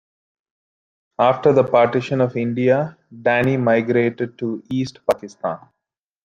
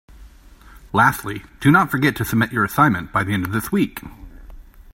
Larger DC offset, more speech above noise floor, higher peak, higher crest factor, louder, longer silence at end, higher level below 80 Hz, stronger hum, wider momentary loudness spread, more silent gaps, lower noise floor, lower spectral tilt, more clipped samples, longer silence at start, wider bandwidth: neither; first, 64 dB vs 26 dB; about the same, -2 dBFS vs 0 dBFS; about the same, 18 dB vs 20 dB; about the same, -19 LUFS vs -19 LUFS; first, 0.7 s vs 0 s; second, -62 dBFS vs -44 dBFS; neither; first, 12 LU vs 9 LU; neither; first, -83 dBFS vs -45 dBFS; first, -7.5 dB/octave vs -6 dB/octave; neither; first, 1.2 s vs 0.2 s; about the same, 15.5 kHz vs 16.5 kHz